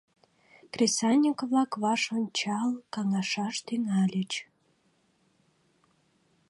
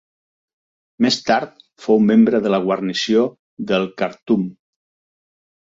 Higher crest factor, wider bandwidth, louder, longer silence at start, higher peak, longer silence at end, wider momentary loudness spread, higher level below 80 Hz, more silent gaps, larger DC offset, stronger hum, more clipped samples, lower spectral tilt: about the same, 18 dB vs 16 dB; first, 11.5 kHz vs 7.6 kHz; second, -28 LUFS vs -18 LUFS; second, 0.75 s vs 1 s; second, -12 dBFS vs -4 dBFS; first, 2.05 s vs 1.15 s; second, 8 LU vs 13 LU; second, -78 dBFS vs -62 dBFS; second, none vs 3.39-3.57 s, 4.22-4.26 s; neither; neither; neither; second, -4 dB/octave vs -5.5 dB/octave